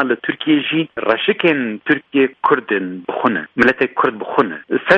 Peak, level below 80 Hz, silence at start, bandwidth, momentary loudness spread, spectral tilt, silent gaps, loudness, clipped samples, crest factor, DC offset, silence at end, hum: 0 dBFS; -56 dBFS; 0 s; 8 kHz; 5 LU; -6.5 dB/octave; none; -17 LUFS; under 0.1%; 16 dB; under 0.1%; 0 s; none